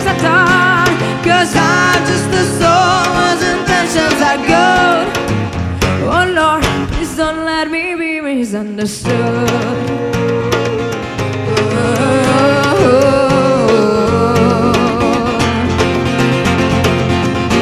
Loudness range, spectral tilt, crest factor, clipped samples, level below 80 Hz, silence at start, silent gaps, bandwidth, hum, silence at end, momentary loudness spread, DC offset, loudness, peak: 5 LU; -5 dB/octave; 12 dB; under 0.1%; -32 dBFS; 0 s; none; 15.5 kHz; none; 0 s; 7 LU; under 0.1%; -12 LUFS; 0 dBFS